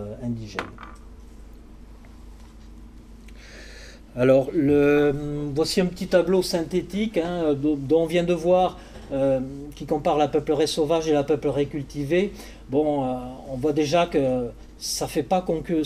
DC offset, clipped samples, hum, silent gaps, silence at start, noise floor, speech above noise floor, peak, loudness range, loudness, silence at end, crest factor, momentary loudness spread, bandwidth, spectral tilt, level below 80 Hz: under 0.1%; under 0.1%; none; none; 0 s; -44 dBFS; 21 dB; -6 dBFS; 4 LU; -23 LUFS; 0 s; 18 dB; 15 LU; 15.5 kHz; -5.5 dB/octave; -44 dBFS